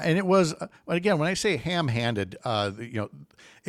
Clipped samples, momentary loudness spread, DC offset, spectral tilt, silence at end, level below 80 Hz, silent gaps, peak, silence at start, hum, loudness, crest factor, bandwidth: under 0.1%; 12 LU; under 0.1%; -5.5 dB/octave; 0.45 s; -60 dBFS; none; -10 dBFS; 0 s; none; -26 LUFS; 16 dB; 13.5 kHz